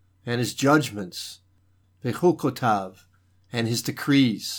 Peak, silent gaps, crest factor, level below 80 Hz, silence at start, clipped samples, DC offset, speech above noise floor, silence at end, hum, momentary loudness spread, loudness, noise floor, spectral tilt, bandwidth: -6 dBFS; none; 18 dB; -70 dBFS; 0.25 s; under 0.1%; under 0.1%; 39 dB; 0 s; none; 13 LU; -24 LUFS; -62 dBFS; -5 dB/octave; 19.5 kHz